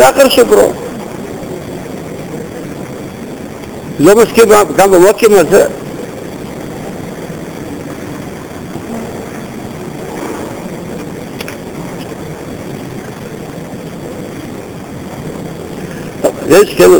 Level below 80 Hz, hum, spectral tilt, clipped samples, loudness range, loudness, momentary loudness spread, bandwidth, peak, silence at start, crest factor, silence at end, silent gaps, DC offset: -40 dBFS; none; -4.5 dB/octave; 0.5%; 16 LU; -12 LUFS; 19 LU; 20 kHz; 0 dBFS; 0 s; 12 dB; 0 s; none; under 0.1%